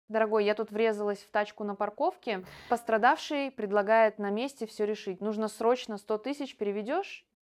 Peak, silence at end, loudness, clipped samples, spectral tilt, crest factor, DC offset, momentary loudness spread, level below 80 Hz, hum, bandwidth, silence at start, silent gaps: -12 dBFS; 0.3 s; -30 LUFS; under 0.1%; -5 dB/octave; 18 dB; under 0.1%; 9 LU; -76 dBFS; none; 14.5 kHz; 0.1 s; none